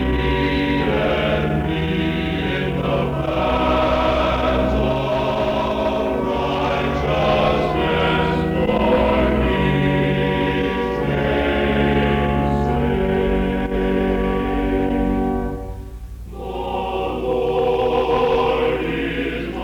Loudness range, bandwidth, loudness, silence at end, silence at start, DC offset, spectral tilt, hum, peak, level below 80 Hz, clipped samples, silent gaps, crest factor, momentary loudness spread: 4 LU; 19 kHz; -19 LUFS; 0 s; 0 s; under 0.1%; -7.5 dB/octave; none; -4 dBFS; -30 dBFS; under 0.1%; none; 14 dB; 5 LU